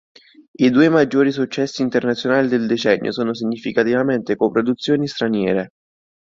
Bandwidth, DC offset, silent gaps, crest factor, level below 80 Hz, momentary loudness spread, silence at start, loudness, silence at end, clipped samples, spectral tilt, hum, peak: 7.6 kHz; under 0.1%; none; 16 dB; -58 dBFS; 8 LU; 0.6 s; -18 LUFS; 0.7 s; under 0.1%; -6 dB/octave; none; -2 dBFS